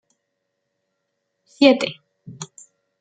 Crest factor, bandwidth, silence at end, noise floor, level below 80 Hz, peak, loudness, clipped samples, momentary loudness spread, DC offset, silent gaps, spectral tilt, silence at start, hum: 22 dB; 9.2 kHz; 0.55 s; -76 dBFS; -70 dBFS; -2 dBFS; -17 LUFS; under 0.1%; 22 LU; under 0.1%; none; -4 dB/octave; 1.6 s; none